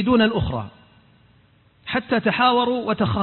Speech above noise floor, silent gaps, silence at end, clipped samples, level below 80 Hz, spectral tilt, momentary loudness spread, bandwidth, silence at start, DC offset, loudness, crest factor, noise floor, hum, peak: 37 dB; none; 0 s; under 0.1%; -42 dBFS; -11 dB/octave; 13 LU; 4.3 kHz; 0 s; under 0.1%; -21 LUFS; 16 dB; -56 dBFS; none; -6 dBFS